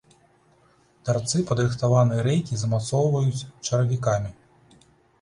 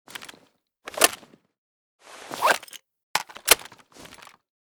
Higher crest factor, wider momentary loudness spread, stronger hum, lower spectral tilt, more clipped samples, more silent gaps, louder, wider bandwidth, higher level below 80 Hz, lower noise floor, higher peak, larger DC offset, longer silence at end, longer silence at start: second, 18 dB vs 28 dB; second, 7 LU vs 25 LU; neither; first, -6 dB/octave vs 0.5 dB/octave; neither; second, none vs 1.58-1.99 s, 3.03-3.14 s; about the same, -24 LUFS vs -22 LUFS; second, 11 kHz vs over 20 kHz; first, -52 dBFS vs -60 dBFS; about the same, -60 dBFS vs -62 dBFS; second, -8 dBFS vs 0 dBFS; neither; second, 0.9 s vs 1.05 s; first, 1.05 s vs 0.2 s